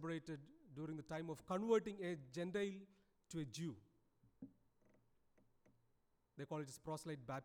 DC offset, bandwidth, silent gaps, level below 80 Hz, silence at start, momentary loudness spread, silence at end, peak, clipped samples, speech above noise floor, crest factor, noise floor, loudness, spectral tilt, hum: under 0.1%; 17.5 kHz; none; -78 dBFS; 0 s; 23 LU; 0 s; -26 dBFS; under 0.1%; 35 dB; 22 dB; -81 dBFS; -46 LUFS; -6 dB/octave; none